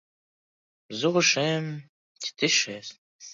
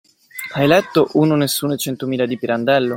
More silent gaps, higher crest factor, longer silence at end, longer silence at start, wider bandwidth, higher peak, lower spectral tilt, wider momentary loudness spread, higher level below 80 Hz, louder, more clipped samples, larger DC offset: first, 1.89-2.15 s, 2.98-3.19 s vs none; about the same, 20 dB vs 16 dB; about the same, 0 s vs 0 s; first, 0.9 s vs 0.35 s; second, 7.8 kHz vs 16.5 kHz; second, -8 dBFS vs -2 dBFS; second, -3 dB/octave vs -5 dB/octave; first, 18 LU vs 10 LU; second, -76 dBFS vs -58 dBFS; second, -24 LUFS vs -17 LUFS; neither; neither